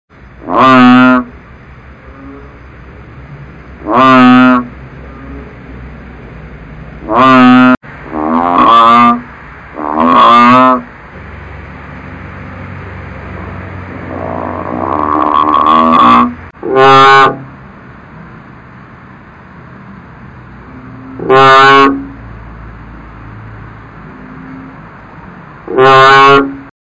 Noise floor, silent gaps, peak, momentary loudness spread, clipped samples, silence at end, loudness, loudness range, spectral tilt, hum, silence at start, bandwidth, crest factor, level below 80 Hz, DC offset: -34 dBFS; 7.77-7.81 s; 0 dBFS; 26 LU; under 0.1%; 0.15 s; -6 LUFS; 15 LU; -6 dB/octave; none; 0.4 s; 8 kHz; 10 dB; -36 dBFS; under 0.1%